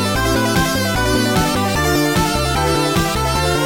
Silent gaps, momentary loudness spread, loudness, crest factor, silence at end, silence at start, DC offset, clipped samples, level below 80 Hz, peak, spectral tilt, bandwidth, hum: none; 1 LU; -16 LUFS; 12 dB; 0 s; 0 s; 0.7%; under 0.1%; -28 dBFS; -4 dBFS; -4.5 dB/octave; 17 kHz; none